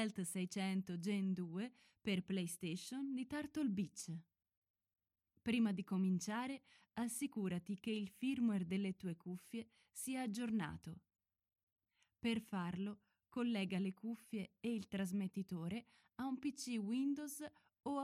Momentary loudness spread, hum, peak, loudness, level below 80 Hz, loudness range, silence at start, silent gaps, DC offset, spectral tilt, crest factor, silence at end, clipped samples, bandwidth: 11 LU; none; -28 dBFS; -43 LUFS; -80 dBFS; 4 LU; 0 s; 4.57-4.62 s, 4.70-4.74 s, 11.63-11.76 s; under 0.1%; -5.5 dB/octave; 16 dB; 0 s; under 0.1%; 15.5 kHz